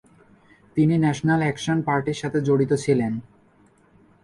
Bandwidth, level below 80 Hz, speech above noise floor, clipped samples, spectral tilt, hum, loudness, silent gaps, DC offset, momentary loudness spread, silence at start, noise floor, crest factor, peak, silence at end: 11.5 kHz; -56 dBFS; 36 dB; under 0.1%; -7 dB/octave; none; -22 LUFS; none; under 0.1%; 6 LU; 0.75 s; -57 dBFS; 16 dB; -8 dBFS; 1 s